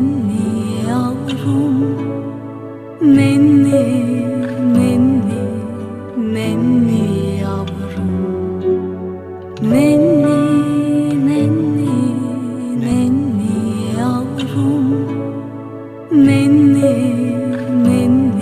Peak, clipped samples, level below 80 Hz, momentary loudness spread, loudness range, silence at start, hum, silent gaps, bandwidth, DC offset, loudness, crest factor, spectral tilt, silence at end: -2 dBFS; under 0.1%; -48 dBFS; 14 LU; 4 LU; 0 s; none; none; 13.5 kHz; under 0.1%; -15 LUFS; 12 dB; -7.5 dB/octave; 0 s